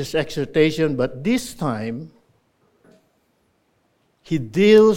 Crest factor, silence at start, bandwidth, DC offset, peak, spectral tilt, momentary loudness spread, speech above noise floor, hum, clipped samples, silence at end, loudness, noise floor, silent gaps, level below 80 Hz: 18 dB; 0 s; 16.5 kHz; under 0.1%; -2 dBFS; -6 dB/octave; 14 LU; 47 dB; none; under 0.1%; 0 s; -20 LUFS; -65 dBFS; none; -50 dBFS